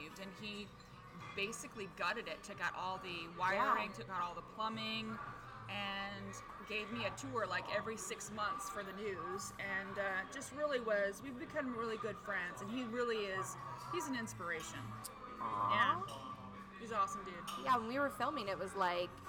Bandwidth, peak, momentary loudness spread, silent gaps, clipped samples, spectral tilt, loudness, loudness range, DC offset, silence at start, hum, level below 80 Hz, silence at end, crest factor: 19.5 kHz; -20 dBFS; 12 LU; none; under 0.1%; -3.5 dB/octave; -41 LUFS; 3 LU; under 0.1%; 0 s; none; -68 dBFS; 0 s; 22 dB